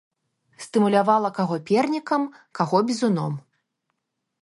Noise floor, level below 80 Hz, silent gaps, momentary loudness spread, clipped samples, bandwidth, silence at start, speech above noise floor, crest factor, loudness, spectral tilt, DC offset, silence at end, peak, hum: -78 dBFS; -74 dBFS; none; 12 LU; under 0.1%; 11.5 kHz; 0.6 s; 56 dB; 20 dB; -23 LUFS; -6.5 dB/octave; under 0.1%; 1.05 s; -4 dBFS; none